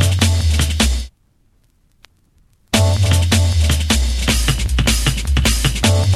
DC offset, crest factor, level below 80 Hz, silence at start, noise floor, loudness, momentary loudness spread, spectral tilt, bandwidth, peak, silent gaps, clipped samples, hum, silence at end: under 0.1%; 16 dB; -20 dBFS; 0 s; -57 dBFS; -16 LUFS; 3 LU; -4 dB/octave; 15 kHz; 0 dBFS; none; under 0.1%; none; 0 s